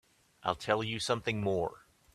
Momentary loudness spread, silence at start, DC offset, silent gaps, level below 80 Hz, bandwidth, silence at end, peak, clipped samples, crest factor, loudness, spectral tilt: 6 LU; 0.45 s; under 0.1%; none; -62 dBFS; 14 kHz; 0.35 s; -12 dBFS; under 0.1%; 22 dB; -33 LUFS; -4.5 dB/octave